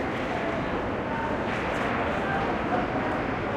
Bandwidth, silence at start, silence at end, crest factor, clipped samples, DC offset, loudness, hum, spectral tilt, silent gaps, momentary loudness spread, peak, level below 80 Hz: 14 kHz; 0 s; 0 s; 14 dB; under 0.1%; under 0.1%; -28 LUFS; none; -6.5 dB/octave; none; 2 LU; -14 dBFS; -44 dBFS